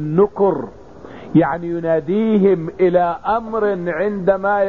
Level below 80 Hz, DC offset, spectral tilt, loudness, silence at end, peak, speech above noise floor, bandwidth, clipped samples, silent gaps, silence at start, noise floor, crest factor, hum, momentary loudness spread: -48 dBFS; 0.5%; -10 dB/octave; -17 LUFS; 0 s; -2 dBFS; 20 dB; 4.4 kHz; under 0.1%; none; 0 s; -36 dBFS; 14 dB; none; 7 LU